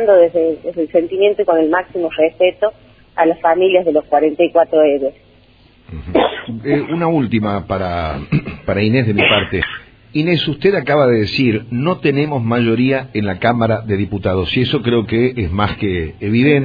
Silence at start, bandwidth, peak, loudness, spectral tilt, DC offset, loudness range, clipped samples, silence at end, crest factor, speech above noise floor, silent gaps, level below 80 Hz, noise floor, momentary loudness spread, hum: 0 s; 5 kHz; 0 dBFS; -15 LUFS; -9 dB/octave; under 0.1%; 3 LU; under 0.1%; 0 s; 16 dB; 33 dB; none; -40 dBFS; -48 dBFS; 8 LU; none